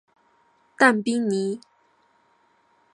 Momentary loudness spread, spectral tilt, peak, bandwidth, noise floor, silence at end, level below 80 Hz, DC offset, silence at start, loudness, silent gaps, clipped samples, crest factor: 12 LU; -4.5 dB/octave; -2 dBFS; 11 kHz; -63 dBFS; 1.35 s; -78 dBFS; under 0.1%; 0.8 s; -21 LUFS; none; under 0.1%; 24 dB